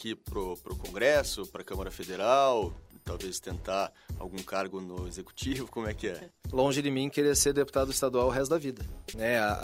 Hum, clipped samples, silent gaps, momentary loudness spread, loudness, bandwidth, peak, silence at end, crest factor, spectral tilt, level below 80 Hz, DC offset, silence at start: none; under 0.1%; none; 15 LU; -30 LUFS; 16 kHz; -10 dBFS; 0 s; 20 dB; -4 dB/octave; -46 dBFS; under 0.1%; 0 s